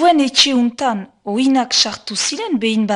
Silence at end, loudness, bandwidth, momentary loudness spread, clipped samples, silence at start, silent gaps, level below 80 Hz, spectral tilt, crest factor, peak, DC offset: 0 s; -16 LUFS; 11 kHz; 9 LU; under 0.1%; 0 s; none; -60 dBFS; -2.5 dB/octave; 16 dB; 0 dBFS; under 0.1%